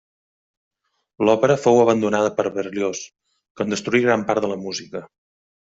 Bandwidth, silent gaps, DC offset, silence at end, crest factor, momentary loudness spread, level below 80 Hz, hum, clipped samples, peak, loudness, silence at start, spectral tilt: 8 kHz; 3.50-3.55 s; under 0.1%; 0.7 s; 18 dB; 15 LU; -62 dBFS; none; under 0.1%; -2 dBFS; -20 LUFS; 1.2 s; -5 dB/octave